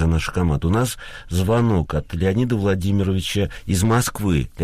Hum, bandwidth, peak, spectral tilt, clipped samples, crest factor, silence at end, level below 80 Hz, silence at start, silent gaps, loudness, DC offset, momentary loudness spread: none; 15.5 kHz; -8 dBFS; -6 dB/octave; under 0.1%; 12 dB; 0 s; -32 dBFS; 0 s; none; -21 LUFS; under 0.1%; 5 LU